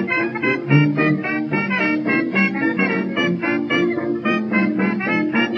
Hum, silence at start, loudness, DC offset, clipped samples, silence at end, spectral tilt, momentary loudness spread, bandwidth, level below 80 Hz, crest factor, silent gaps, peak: none; 0 s; -19 LUFS; under 0.1%; under 0.1%; 0 s; -7.5 dB/octave; 4 LU; 6.6 kHz; -68 dBFS; 16 dB; none; -4 dBFS